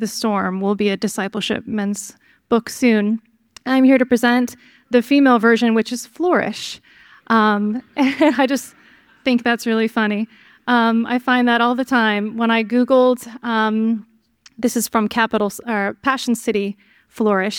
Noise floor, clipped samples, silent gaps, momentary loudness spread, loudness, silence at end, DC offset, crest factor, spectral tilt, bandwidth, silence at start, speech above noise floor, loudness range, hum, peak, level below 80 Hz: -53 dBFS; under 0.1%; none; 11 LU; -18 LUFS; 0 s; under 0.1%; 16 dB; -4.5 dB/octave; 17.5 kHz; 0 s; 35 dB; 4 LU; none; -2 dBFS; -62 dBFS